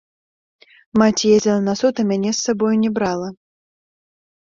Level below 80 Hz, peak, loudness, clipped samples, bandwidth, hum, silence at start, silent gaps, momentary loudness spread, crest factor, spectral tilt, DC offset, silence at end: -56 dBFS; -2 dBFS; -18 LUFS; under 0.1%; 7.6 kHz; none; 0.95 s; none; 7 LU; 18 dB; -5 dB/octave; under 0.1%; 1.1 s